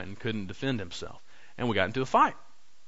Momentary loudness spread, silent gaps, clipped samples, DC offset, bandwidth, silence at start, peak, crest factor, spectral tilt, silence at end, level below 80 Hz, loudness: 15 LU; none; under 0.1%; 0.9%; 8 kHz; 0 s; -10 dBFS; 22 dB; -5.5 dB/octave; 0.5 s; -60 dBFS; -29 LUFS